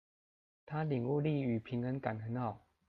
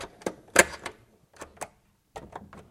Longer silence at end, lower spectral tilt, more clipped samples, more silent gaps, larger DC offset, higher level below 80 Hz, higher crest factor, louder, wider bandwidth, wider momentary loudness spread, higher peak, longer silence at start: first, 0.3 s vs 0.1 s; first, -10.5 dB/octave vs -1.5 dB/octave; neither; neither; neither; second, -72 dBFS vs -56 dBFS; second, 16 dB vs 32 dB; second, -37 LUFS vs -24 LUFS; second, 4.8 kHz vs 16.5 kHz; second, 6 LU vs 26 LU; second, -22 dBFS vs 0 dBFS; first, 0.65 s vs 0 s